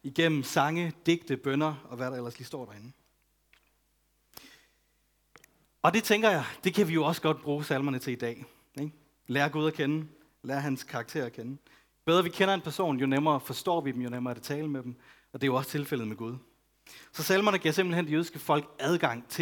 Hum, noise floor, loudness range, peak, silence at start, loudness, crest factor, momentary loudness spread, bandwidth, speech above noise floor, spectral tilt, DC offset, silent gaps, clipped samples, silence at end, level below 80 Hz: none; -72 dBFS; 7 LU; -8 dBFS; 0.05 s; -30 LUFS; 22 dB; 15 LU; 19.5 kHz; 42 dB; -5 dB/octave; under 0.1%; none; under 0.1%; 0 s; -72 dBFS